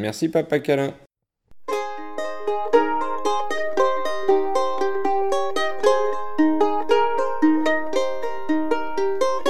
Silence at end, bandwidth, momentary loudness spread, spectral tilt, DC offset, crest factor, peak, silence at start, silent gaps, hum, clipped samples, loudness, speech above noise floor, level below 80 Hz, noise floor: 0 s; 14 kHz; 8 LU; -5 dB/octave; 5%; 18 dB; -4 dBFS; 0 s; 1.06-1.10 s; none; under 0.1%; -22 LUFS; 29 dB; -62 dBFS; -50 dBFS